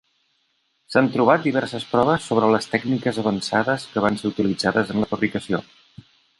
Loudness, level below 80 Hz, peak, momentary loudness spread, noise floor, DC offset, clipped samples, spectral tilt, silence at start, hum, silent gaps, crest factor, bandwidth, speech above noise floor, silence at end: -21 LUFS; -56 dBFS; -2 dBFS; 6 LU; -68 dBFS; under 0.1%; under 0.1%; -6 dB/octave; 0.9 s; none; none; 20 dB; 11.5 kHz; 48 dB; 0.8 s